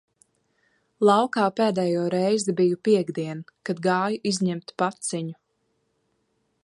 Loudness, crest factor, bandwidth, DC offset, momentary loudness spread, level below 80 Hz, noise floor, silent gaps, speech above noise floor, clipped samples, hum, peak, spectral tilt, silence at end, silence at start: -24 LUFS; 20 dB; 11.5 kHz; under 0.1%; 12 LU; -72 dBFS; -72 dBFS; none; 49 dB; under 0.1%; none; -4 dBFS; -5.5 dB/octave; 1.35 s; 1 s